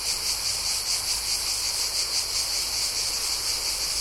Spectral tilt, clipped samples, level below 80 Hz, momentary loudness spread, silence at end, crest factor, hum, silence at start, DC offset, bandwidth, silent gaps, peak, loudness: 1.5 dB/octave; under 0.1%; -48 dBFS; 1 LU; 0 s; 14 dB; none; 0 s; under 0.1%; 16.5 kHz; none; -12 dBFS; -24 LUFS